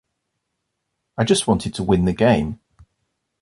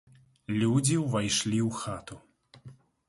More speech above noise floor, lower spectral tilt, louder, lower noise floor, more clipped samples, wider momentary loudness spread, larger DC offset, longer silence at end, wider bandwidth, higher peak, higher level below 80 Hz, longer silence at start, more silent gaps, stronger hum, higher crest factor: first, 59 dB vs 25 dB; about the same, -5.5 dB/octave vs -4.5 dB/octave; first, -19 LUFS vs -28 LUFS; first, -77 dBFS vs -53 dBFS; neither; about the same, 15 LU vs 16 LU; neither; first, 0.85 s vs 0.35 s; about the same, 11.5 kHz vs 11.5 kHz; first, -2 dBFS vs -12 dBFS; first, -42 dBFS vs -60 dBFS; first, 1.2 s vs 0.5 s; neither; neither; about the same, 20 dB vs 18 dB